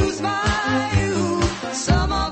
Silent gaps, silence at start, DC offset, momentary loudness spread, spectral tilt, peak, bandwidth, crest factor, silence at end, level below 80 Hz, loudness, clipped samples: none; 0 s; under 0.1%; 3 LU; -5 dB/octave; -4 dBFS; 8.8 kHz; 16 dB; 0 s; -30 dBFS; -21 LUFS; under 0.1%